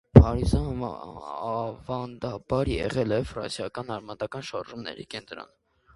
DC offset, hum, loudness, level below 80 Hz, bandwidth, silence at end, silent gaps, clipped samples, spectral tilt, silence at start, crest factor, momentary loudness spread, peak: under 0.1%; none; -28 LUFS; -34 dBFS; 11.5 kHz; 0.5 s; none; under 0.1%; -7.5 dB/octave; 0.15 s; 26 dB; 13 LU; 0 dBFS